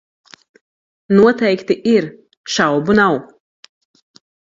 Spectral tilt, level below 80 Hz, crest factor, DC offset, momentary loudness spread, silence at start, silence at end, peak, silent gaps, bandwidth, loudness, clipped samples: -5.5 dB/octave; -54 dBFS; 18 dB; under 0.1%; 11 LU; 1.1 s; 1.15 s; 0 dBFS; 2.37-2.44 s; 7.6 kHz; -15 LUFS; under 0.1%